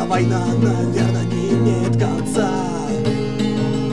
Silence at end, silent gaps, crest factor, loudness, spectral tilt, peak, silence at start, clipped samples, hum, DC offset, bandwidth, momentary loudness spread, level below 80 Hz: 0 s; none; 14 dB; -19 LUFS; -7 dB/octave; -4 dBFS; 0 s; under 0.1%; none; 2%; 12 kHz; 3 LU; -44 dBFS